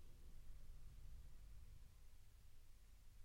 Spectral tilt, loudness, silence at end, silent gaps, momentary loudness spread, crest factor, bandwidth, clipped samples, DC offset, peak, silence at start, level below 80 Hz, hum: -5 dB/octave; -66 LUFS; 0 s; none; 3 LU; 12 dB; 16.5 kHz; under 0.1%; under 0.1%; -44 dBFS; 0 s; -60 dBFS; none